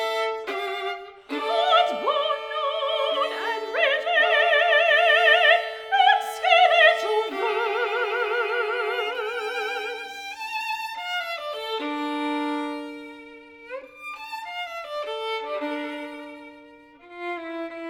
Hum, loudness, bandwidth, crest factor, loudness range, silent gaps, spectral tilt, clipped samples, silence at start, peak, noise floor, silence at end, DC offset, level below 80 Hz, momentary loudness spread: none; -23 LUFS; 17.5 kHz; 20 dB; 14 LU; none; -1 dB/octave; under 0.1%; 0 s; -4 dBFS; -49 dBFS; 0 s; under 0.1%; -72 dBFS; 18 LU